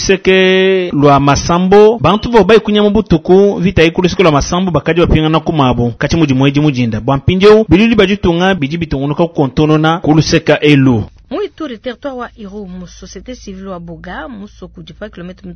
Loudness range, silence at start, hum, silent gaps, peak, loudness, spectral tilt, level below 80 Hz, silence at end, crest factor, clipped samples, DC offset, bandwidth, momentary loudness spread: 16 LU; 0 s; none; none; 0 dBFS; -10 LUFS; -6 dB/octave; -30 dBFS; 0 s; 10 dB; 0.8%; under 0.1%; 8 kHz; 20 LU